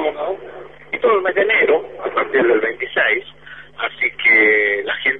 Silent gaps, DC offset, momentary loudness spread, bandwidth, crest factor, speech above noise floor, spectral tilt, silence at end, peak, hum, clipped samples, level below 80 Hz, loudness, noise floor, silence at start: none; 0.5%; 15 LU; 4.4 kHz; 14 dB; 22 dB; -6 dB/octave; 0 s; -4 dBFS; none; under 0.1%; -58 dBFS; -16 LUFS; -38 dBFS; 0 s